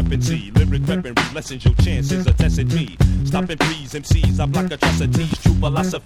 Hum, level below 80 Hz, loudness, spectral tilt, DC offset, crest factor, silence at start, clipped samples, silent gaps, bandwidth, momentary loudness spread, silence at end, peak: none; -24 dBFS; -19 LUFS; -6 dB/octave; under 0.1%; 16 dB; 0 s; under 0.1%; none; 15 kHz; 4 LU; 0.05 s; -2 dBFS